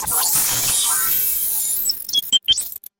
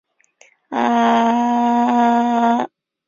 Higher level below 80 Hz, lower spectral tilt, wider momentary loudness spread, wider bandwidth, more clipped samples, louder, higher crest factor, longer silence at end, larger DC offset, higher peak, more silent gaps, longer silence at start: first, -50 dBFS vs -66 dBFS; second, 1.5 dB/octave vs -5 dB/octave; second, 3 LU vs 7 LU; first, 17 kHz vs 7.2 kHz; neither; about the same, -16 LUFS vs -16 LUFS; about the same, 16 dB vs 14 dB; second, 0.25 s vs 0.4 s; neither; about the same, -4 dBFS vs -4 dBFS; neither; second, 0 s vs 0.7 s